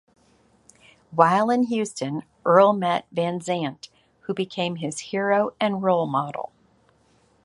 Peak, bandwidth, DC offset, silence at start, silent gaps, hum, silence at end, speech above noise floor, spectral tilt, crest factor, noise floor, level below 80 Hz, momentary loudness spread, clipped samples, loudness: -2 dBFS; 11.5 kHz; under 0.1%; 1.1 s; none; none; 1 s; 39 dB; -5.5 dB/octave; 22 dB; -61 dBFS; -68 dBFS; 14 LU; under 0.1%; -23 LUFS